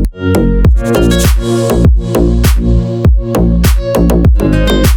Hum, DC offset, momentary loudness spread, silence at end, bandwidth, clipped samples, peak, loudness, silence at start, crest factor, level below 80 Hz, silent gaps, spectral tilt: none; under 0.1%; 3 LU; 0 s; 19.5 kHz; under 0.1%; 0 dBFS; -10 LUFS; 0 s; 8 dB; -12 dBFS; none; -6.5 dB/octave